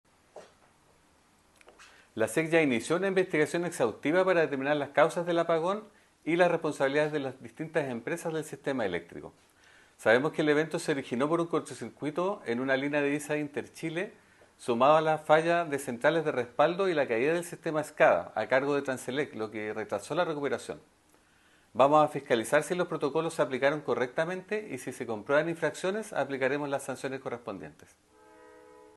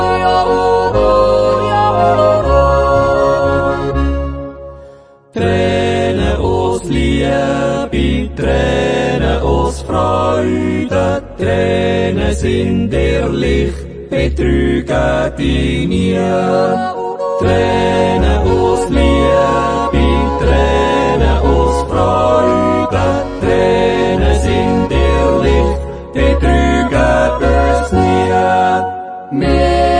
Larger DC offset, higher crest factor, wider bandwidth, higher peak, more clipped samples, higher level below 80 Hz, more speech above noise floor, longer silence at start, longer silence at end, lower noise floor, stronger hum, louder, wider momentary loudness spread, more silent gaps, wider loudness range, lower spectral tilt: neither; first, 22 dB vs 12 dB; first, 12.5 kHz vs 10.5 kHz; second, -8 dBFS vs 0 dBFS; neither; second, -74 dBFS vs -20 dBFS; first, 36 dB vs 26 dB; first, 0.35 s vs 0 s; first, 1.25 s vs 0 s; first, -64 dBFS vs -40 dBFS; neither; second, -29 LUFS vs -13 LUFS; first, 12 LU vs 5 LU; neither; about the same, 5 LU vs 3 LU; second, -5 dB/octave vs -6.5 dB/octave